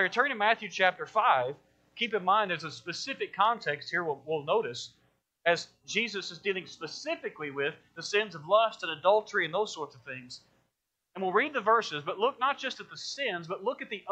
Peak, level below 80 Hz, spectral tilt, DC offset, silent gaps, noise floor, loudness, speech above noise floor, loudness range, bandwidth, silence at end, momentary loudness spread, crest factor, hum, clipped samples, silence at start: -10 dBFS; -80 dBFS; -3 dB/octave; under 0.1%; none; -82 dBFS; -30 LUFS; 51 dB; 4 LU; 8.8 kHz; 0 s; 13 LU; 22 dB; none; under 0.1%; 0 s